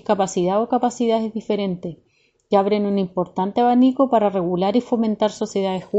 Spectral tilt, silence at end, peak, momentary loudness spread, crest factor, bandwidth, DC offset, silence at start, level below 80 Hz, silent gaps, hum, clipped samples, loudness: -6.5 dB/octave; 0 s; -4 dBFS; 7 LU; 16 dB; 8.2 kHz; under 0.1%; 0.1 s; -60 dBFS; none; none; under 0.1%; -20 LUFS